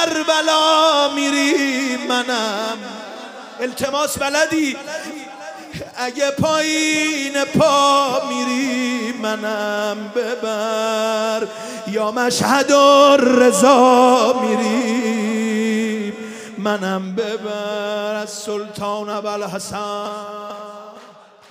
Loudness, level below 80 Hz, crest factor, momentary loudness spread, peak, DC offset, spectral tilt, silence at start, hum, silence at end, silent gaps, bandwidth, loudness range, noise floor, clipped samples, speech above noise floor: -17 LUFS; -60 dBFS; 18 dB; 17 LU; 0 dBFS; under 0.1%; -3.5 dB/octave; 0 s; none; 0.4 s; none; 16 kHz; 11 LU; -44 dBFS; under 0.1%; 27 dB